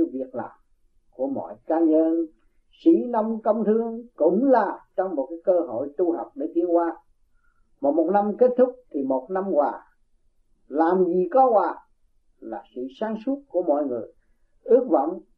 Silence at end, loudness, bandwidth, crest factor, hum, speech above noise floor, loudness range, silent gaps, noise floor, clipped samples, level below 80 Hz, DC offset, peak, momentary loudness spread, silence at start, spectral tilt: 0.15 s; -23 LUFS; 4.4 kHz; 18 dB; none; 40 dB; 3 LU; none; -62 dBFS; under 0.1%; -64 dBFS; under 0.1%; -6 dBFS; 14 LU; 0 s; -10.5 dB/octave